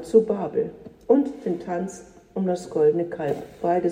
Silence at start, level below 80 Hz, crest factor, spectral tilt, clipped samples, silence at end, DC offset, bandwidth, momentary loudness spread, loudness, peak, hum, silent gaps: 0 s; -60 dBFS; 18 dB; -7.5 dB/octave; under 0.1%; 0 s; under 0.1%; 10.5 kHz; 13 LU; -24 LUFS; -6 dBFS; none; none